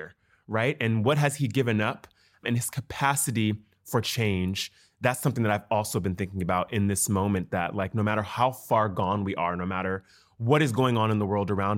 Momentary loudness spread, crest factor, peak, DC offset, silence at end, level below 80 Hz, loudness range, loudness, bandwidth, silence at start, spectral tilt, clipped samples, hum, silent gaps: 7 LU; 18 dB; -8 dBFS; under 0.1%; 0 s; -62 dBFS; 2 LU; -27 LUFS; 16.5 kHz; 0 s; -5 dB/octave; under 0.1%; none; none